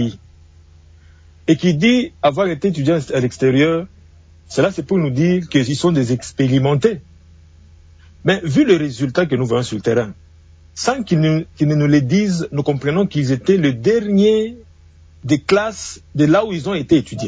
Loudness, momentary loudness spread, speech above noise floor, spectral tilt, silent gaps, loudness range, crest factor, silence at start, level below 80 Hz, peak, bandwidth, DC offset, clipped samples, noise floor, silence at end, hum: -17 LUFS; 8 LU; 29 dB; -6.5 dB/octave; none; 2 LU; 16 dB; 0 s; -46 dBFS; -2 dBFS; 8 kHz; under 0.1%; under 0.1%; -45 dBFS; 0 s; none